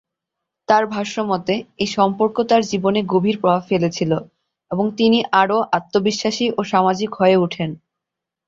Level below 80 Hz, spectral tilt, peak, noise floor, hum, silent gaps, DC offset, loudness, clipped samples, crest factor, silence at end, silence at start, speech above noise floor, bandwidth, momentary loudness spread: -58 dBFS; -5.5 dB/octave; -2 dBFS; -84 dBFS; none; none; under 0.1%; -18 LUFS; under 0.1%; 18 dB; 0.7 s; 0.7 s; 66 dB; 7.8 kHz; 7 LU